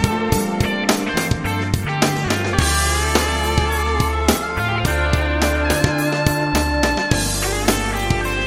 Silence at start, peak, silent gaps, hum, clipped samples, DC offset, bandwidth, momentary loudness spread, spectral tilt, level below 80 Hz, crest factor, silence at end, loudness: 0 s; 0 dBFS; none; none; under 0.1%; 0.3%; 17 kHz; 3 LU; -4.5 dB/octave; -26 dBFS; 18 dB; 0 s; -18 LUFS